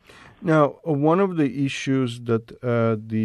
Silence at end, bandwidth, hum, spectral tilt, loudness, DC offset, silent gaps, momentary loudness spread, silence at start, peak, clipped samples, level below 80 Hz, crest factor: 0 s; 11.5 kHz; none; -7 dB/octave; -22 LUFS; under 0.1%; none; 6 LU; 0.4 s; -6 dBFS; under 0.1%; -64 dBFS; 16 dB